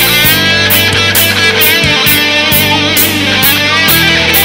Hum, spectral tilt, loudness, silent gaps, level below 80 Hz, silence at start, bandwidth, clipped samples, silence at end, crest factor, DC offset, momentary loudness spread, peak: none; -2.5 dB/octave; -6 LUFS; none; -32 dBFS; 0 s; over 20 kHz; 0.7%; 0 s; 8 dB; 0.2%; 2 LU; 0 dBFS